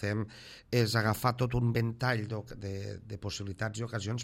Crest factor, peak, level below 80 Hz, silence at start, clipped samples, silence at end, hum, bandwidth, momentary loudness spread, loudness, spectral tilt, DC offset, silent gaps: 20 dB; -12 dBFS; -54 dBFS; 0 s; under 0.1%; 0 s; none; 16 kHz; 12 LU; -33 LUFS; -5.5 dB/octave; under 0.1%; none